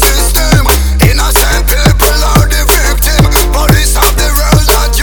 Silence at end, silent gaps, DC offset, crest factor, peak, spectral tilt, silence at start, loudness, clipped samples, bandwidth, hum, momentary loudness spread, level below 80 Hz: 0 s; none; under 0.1%; 6 dB; 0 dBFS; -3.5 dB/octave; 0 s; -8 LUFS; 1%; over 20 kHz; none; 2 LU; -10 dBFS